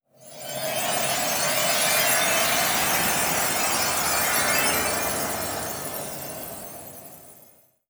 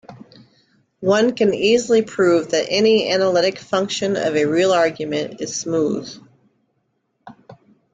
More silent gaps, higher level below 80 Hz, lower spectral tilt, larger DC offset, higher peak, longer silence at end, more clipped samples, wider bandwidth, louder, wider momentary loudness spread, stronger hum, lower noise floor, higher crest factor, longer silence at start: neither; first, -54 dBFS vs -60 dBFS; second, -1 dB/octave vs -4 dB/octave; neither; second, -8 dBFS vs -4 dBFS; first, 0.55 s vs 0.4 s; neither; first, over 20 kHz vs 9.4 kHz; second, -22 LUFS vs -18 LUFS; first, 16 LU vs 9 LU; neither; second, -55 dBFS vs -69 dBFS; about the same, 16 dB vs 16 dB; about the same, 0.2 s vs 0.1 s